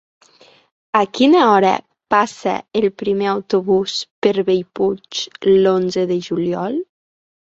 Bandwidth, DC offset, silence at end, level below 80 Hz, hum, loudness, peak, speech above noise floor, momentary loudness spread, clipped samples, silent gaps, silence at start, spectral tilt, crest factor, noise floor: 8 kHz; under 0.1%; 0.65 s; -60 dBFS; none; -17 LUFS; -2 dBFS; 34 dB; 10 LU; under 0.1%; 4.11-4.22 s; 0.95 s; -5.5 dB/octave; 16 dB; -50 dBFS